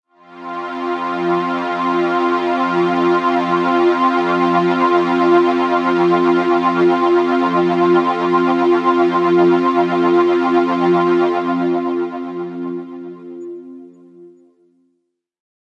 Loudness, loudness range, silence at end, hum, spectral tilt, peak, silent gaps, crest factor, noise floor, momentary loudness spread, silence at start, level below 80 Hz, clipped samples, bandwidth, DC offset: -15 LUFS; 10 LU; 1.45 s; none; -7 dB/octave; -2 dBFS; none; 14 dB; -70 dBFS; 12 LU; 0.3 s; -70 dBFS; under 0.1%; 7 kHz; under 0.1%